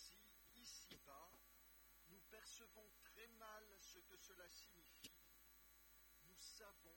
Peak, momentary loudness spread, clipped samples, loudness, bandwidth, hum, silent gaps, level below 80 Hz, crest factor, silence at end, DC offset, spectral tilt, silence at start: -44 dBFS; 8 LU; under 0.1%; -63 LUFS; 17.5 kHz; none; none; -80 dBFS; 20 dB; 0 s; under 0.1%; -1 dB/octave; 0 s